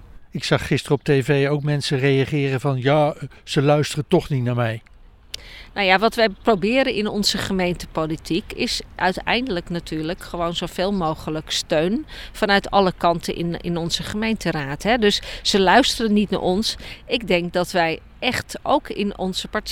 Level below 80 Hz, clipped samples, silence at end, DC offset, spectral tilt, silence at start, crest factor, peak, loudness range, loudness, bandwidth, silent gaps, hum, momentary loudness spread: -42 dBFS; under 0.1%; 0 s; under 0.1%; -5 dB/octave; 0 s; 20 dB; 0 dBFS; 4 LU; -21 LUFS; 17 kHz; none; none; 9 LU